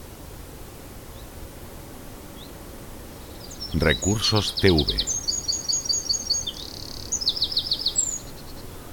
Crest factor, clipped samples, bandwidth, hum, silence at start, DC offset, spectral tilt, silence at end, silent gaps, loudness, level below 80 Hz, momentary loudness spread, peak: 22 dB; under 0.1%; 17.5 kHz; none; 0 s; under 0.1%; -2.5 dB/octave; 0 s; none; -23 LUFS; -40 dBFS; 20 LU; -4 dBFS